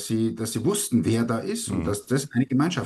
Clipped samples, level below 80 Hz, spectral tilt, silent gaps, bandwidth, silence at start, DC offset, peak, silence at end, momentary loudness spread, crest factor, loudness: under 0.1%; -52 dBFS; -5.5 dB/octave; none; 13 kHz; 0 s; under 0.1%; -10 dBFS; 0 s; 4 LU; 14 dB; -25 LUFS